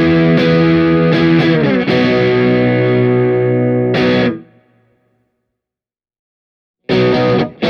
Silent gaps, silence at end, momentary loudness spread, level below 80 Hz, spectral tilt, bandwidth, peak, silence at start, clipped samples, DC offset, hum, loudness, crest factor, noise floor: 6.19-6.74 s; 0 s; 4 LU; -42 dBFS; -8.5 dB/octave; 6.6 kHz; 0 dBFS; 0 s; under 0.1%; under 0.1%; none; -12 LUFS; 12 dB; -89 dBFS